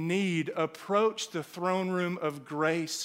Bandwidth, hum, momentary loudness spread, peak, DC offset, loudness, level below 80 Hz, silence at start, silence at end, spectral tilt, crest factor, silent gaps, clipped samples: 16 kHz; none; 7 LU; -14 dBFS; under 0.1%; -30 LUFS; -80 dBFS; 0 s; 0 s; -5 dB/octave; 18 dB; none; under 0.1%